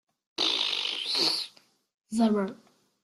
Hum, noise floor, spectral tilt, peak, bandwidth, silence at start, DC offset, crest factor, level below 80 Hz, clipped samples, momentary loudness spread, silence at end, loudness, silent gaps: none; -52 dBFS; -3 dB/octave; -12 dBFS; 13 kHz; 0.4 s; under 0.1%; 20 dB; -72 dBFS; under 0.1%; 11 LU; 0.5 s; -27 LUFS; 1.94-1.98 s